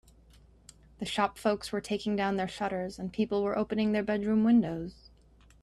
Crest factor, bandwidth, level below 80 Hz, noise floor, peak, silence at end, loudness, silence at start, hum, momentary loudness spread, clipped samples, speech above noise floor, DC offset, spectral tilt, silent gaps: 18 dB; 12.5 kHz; -58 dBFS; -59 dBFS; -14 dBFS; 0.7 s; -30 LUFS; 1 s; none; 10 LU; under 0.1%; 30 dB; under 0.1%; -6 dB/octave; none